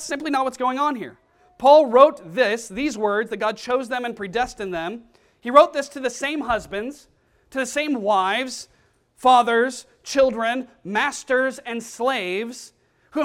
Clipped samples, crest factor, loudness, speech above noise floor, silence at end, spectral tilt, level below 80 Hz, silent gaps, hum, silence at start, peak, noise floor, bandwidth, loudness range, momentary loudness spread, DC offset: under 0.1%; 22 dB; -21 LUFS; 38 dB; 0 s; -3.5 dB/octave; -56 dBFS; none; none; 0 s; 0 dBFS; -59 dBFS; 15 kHz; 5 LU; 16 LU; under 0.1%